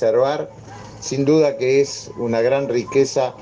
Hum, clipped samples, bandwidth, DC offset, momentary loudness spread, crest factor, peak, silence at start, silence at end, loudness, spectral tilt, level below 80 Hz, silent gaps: none; under 0.1%; 9.8 kHz; under 0.1%; 15 LU; 14 dB; -4 dBFS; 0 s; 0 s; -19 LUFS; -5.5 dB/octave; -56 dBFS; none